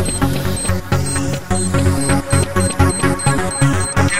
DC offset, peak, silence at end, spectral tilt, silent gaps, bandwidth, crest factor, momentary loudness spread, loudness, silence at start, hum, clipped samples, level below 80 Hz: 4%; 0 dBFS; 0 s; -4.5 dB/octave; none; 16 kHz; 14 dB; 4 LU; -17 LUFS; 0 s; none; under 0.1%; -30 dBFS